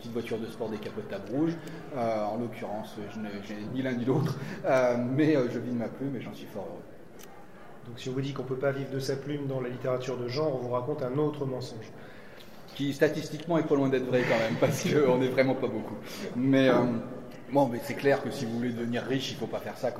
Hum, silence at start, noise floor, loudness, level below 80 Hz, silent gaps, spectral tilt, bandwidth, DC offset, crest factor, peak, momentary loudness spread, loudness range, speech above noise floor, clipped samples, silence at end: none; 0 s; -50 dBFS; -30 LUFS; -62 dBFS; none; -6.5 dB/octave; 16 kHz; 0.4%; 20 dB; -10 dBFS; 16 LU; 7 LU; 20 dB; under 0.1%; 0 s